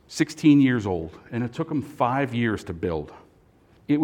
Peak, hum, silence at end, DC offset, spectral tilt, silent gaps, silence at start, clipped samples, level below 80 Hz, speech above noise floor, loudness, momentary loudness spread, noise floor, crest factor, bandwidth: -6 dBFS; none; 0 s; under 0.1%; -6.5 dB/octave; none; 0.1 s; under 0.1%; -56 dBFS; 33 dB; -24 LUFS; 13 LU; -57 dBFS; 18 dB; 11.5 kHz